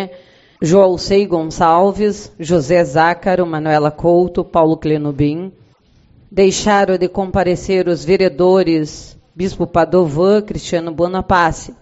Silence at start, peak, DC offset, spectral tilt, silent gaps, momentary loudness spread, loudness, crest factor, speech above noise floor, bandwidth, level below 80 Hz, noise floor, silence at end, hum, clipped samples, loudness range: 0 s; 0 dBFS; under 0.1%; -5.5 dB/octave; none; 9 LU; -14 LUFS; 14 dB; 37 dB; 8 kHz; -38 dBFS; -51 dBFS; 0.1 s; none; under 0.1%; 2 LU